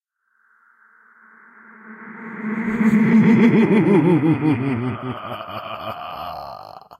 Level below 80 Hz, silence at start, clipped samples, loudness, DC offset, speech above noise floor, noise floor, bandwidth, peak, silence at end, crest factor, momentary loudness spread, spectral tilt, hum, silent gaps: -56 dBFS; 1.85 s; under 0.1%; -18 LUFS; under 0.1%; 48 dB; -65 dBFS; 7.2 kHz; -4 dBFS; 0.05 s; 16 dB; 21 LU; -8.5 dB/octave; none; none